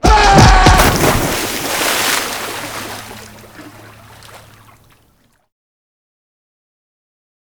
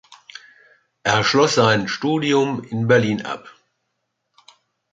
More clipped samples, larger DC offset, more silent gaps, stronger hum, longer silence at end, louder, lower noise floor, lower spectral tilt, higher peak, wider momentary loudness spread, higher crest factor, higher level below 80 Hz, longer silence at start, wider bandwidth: first, 0.3% vs under 0.1%; neither; neither; neither; first, 3.2 s vs 1.45 s; first, -12 LUFS vs -18 LUFS; second, -56 dBFS vs -75 dBFS; about the same, -4 dB/octave vs -4.5 dB/octave; about the same, 0 dBFS vs -2 dBFS; about the same, 20 LU vs 18 LU; about the same, 16 dB vs 20 dB; first, -22 dBFS vs -58 dBFS; about the same, 0.05 s vs 0.1 s; first, over 20 kHz vs 9.4 kHz